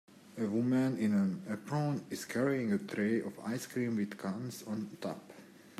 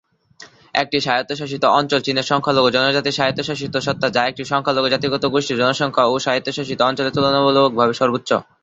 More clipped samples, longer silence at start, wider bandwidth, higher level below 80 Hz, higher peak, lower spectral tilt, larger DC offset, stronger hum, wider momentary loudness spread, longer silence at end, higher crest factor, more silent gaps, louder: neither; second, 0.1 s vs 0.4 s; first, 14.5 kHz vs 8 kHz; second, -80 dBFS vs -56 dBFS; second, -20 dBFS vs 0 dBFS; first, -6.5 dB/octave vs -4.5 dB/octave; neither; neither; first, 11 LU vs 7 LU; second, 0.05 s vs 0.2 s; about the same, 16 dB vs 18 dB; neither; second, -35 LUFS vs -18 LUFS